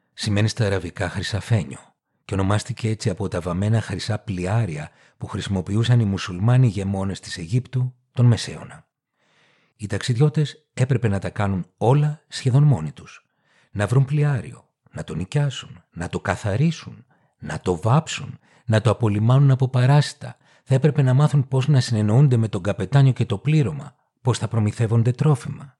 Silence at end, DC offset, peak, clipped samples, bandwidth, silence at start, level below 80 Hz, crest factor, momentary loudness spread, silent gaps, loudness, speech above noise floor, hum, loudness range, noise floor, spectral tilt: 0.1 s; under 0.1%; -4 dBFS; under 0.1%; 11 kHz; 0.2 s; -54 dBFS; 16 dB; 15 LU; none; -21 LUFS; 47 dB; none; 6 LU; -67 dBFS; -7 dB/octave